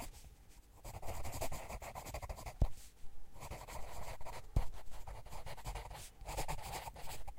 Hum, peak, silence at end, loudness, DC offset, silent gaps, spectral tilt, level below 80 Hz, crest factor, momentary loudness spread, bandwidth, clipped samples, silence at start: none; -18 dBFS; 0 s; -47 LUFS; under 0.1%; none; -4.5 dB/octave; -48 dBFS; 22 dB; 16 LU; 16 kHz; under 0.1%; 0 s